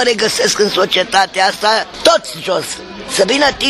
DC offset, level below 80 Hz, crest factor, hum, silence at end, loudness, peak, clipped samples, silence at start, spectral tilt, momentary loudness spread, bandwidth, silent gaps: under 0.1%; -46 dBFS; 14 dB; none; 0 s; -13 LUFS; 0 dBFS; under 0.1%; 0 s; -2 dB/octave; 7 LU; 15.5 kHz; none